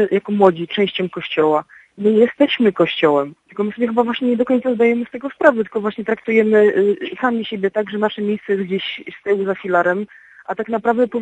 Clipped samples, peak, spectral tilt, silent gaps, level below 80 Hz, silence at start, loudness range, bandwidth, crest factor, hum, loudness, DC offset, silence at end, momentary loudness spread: under 0.1%; 0 dBFS; -7 dB/octave; none; -66 dBFS; 0 s; 4 LU; 8 kHz; 18 dB; none; -18 LUFS; under 0.1%; 0 s; 9 LU